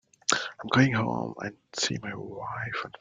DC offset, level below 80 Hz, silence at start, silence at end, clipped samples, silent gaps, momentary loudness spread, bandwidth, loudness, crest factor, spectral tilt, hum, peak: under 0.1%; -64 dBFS; 0.3 s; 0.1 s; under 0.1%; none; 14 LU; 9.6 kHz; -29 LUFS; 26 dB; -4 dB/octave; none; -2 dBFS